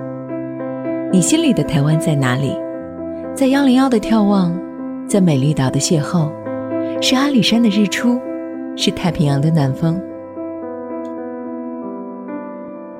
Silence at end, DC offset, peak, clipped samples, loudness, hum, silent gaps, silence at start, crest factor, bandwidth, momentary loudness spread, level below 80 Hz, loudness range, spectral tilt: 0 s; under 0.1%; 0 dBFS; under 0.1%; -17 LUFS; none; none; 0 s; 16 dB; 16 kHz; 14 LU; -48 dBFS; 5 LU; -5.5 dB/octave